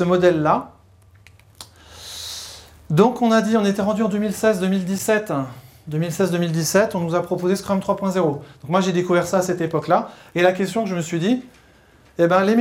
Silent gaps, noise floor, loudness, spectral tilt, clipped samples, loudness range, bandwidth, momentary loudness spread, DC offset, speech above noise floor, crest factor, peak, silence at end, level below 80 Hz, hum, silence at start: none; -52 dBFS; -20 LUFS; -5.5 dB/octave; under 0.1%; 2 LU; 17 kHz; 15 LU; under 0.1%; 33 dB; 18 dB; -2 dBFS; 0 s; -56 dBFS; none; 0 s